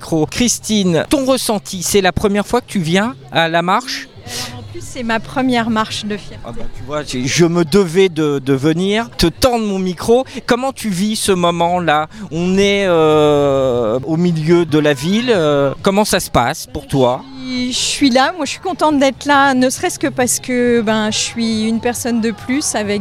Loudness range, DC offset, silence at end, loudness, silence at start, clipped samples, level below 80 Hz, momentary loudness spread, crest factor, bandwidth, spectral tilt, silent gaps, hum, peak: 4 LU; under 0.1%; 0 s; -15 LUFS; 0 s; under 0.1%; -38 dBFS; 10 LU; 14 dB; 16.5 kHz; -4.5 dB/octave; none; none; 0 dBFS